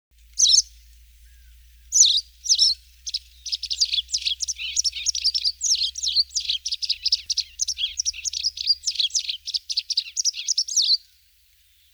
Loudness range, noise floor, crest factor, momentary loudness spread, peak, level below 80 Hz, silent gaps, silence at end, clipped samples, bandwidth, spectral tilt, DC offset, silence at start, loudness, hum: 3 LU; -58 dBFS; 20 dB; 11 LU; -4 dBFS; -54 dBFS; none; 0.95 s; under 0.1%; over 20 kHz; 6.5 dB/octave; under 0.1%; 0.35 s; -21 LUFS; none